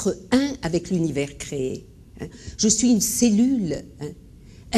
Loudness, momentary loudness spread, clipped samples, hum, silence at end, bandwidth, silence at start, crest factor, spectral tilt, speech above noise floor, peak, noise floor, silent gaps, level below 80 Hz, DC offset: -22 LUFS; 18 LU; under 0.1%; none; 0 s; 13 kHz; 0 s; 18 dB; -4 dB/octave; 22 dB; -4 dBFS; -45 dBFS; none; -46 dBFS; under 0.1%